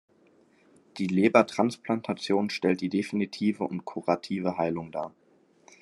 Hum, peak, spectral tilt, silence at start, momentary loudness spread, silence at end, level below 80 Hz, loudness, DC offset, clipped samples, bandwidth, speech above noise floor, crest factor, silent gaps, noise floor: none; -4 dBFS; -6.5 dB/octave; 0.95 s; 12 LU; 0.7 s; -74 dBFS; -28 LUFS; under 0.1%; under 0.1%; 12 kHz; 35 dB; 24 dB; none; -62 dBFS